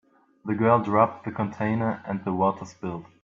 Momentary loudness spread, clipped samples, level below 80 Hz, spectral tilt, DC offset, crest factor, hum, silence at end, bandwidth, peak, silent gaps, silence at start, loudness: 14 LU; under 0.1%; -64 dBFS; -8.5 dB/octave; under 0.1%; 20 dB; none; 0.2 s; 7.4 kHz; -6 dBFS; none; 0.45 s; -25 LUFS